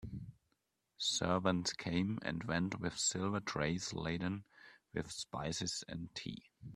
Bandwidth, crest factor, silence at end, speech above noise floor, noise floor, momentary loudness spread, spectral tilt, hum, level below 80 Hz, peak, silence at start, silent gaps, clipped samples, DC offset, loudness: 13 kHz; 22 dB; 0 s; 45 dB; -83 dBFS; 12 LU; -4 dB/octave; none; -64 dBFS; -16 dBFS; 0 s; none; under 0.1%; under 0.1%; -38 LUFS